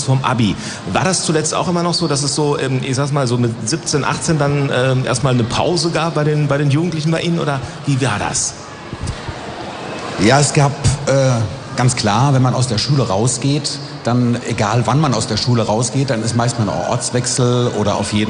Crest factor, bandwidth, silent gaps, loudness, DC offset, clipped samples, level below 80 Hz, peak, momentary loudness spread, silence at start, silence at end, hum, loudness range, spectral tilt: 14 dB; 10 kHz; none; -16 LUFS; under 0.1%; under 0.1%; -40 dBFS; -2 dBFS; 8 LU; 0 s; 0 s; none; 3 LU; -5 dB/octave